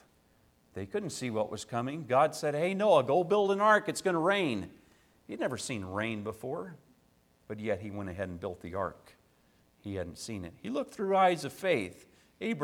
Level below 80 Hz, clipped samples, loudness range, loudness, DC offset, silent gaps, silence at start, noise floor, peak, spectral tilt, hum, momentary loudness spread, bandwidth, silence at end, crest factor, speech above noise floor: -66 dBFS; under 0.1%; 12 LU; -31 LUFS; under 0.1%; none; 0.75 s; -67 dBFS; -12 dBFS; -5 dB/octave; none; 15 LU; 17 kHz; 0 s; 20 dB; 36 dB